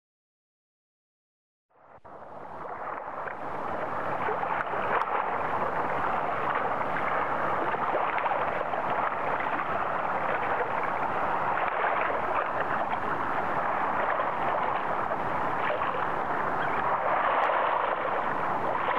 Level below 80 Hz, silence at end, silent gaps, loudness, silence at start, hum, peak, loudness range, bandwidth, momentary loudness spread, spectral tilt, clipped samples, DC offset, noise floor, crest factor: -60 dBFS; 0 s; none; -29 LUFS; 1.7 s; none; -14 dBFS; 7 LU; 13.5 kHz; 6 LU; -6 dB/octave; under 0.1%; 1%; -49 dBFS; 16 dB